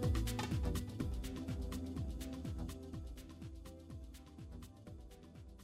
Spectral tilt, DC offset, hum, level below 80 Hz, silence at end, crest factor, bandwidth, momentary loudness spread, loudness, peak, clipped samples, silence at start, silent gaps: -6 dB/octave; under 0.1%; none; -48 dBFS; 0 s; 18 dB; 16 kHz; 16 LU; -45 LUFS; -26 dBFS; under 0.1%; 0 s; none